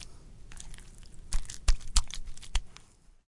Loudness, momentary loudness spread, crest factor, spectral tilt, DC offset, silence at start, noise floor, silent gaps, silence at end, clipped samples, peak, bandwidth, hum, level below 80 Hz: -35 LUFS; 22 LU; 24 dB; -1.5 dB/octave; under 0.1%; 0 s; -56 dBFS; none; 0.65 s; under 0.1%; -6 dBFS; 11.5 kHz; none; -34 dBFS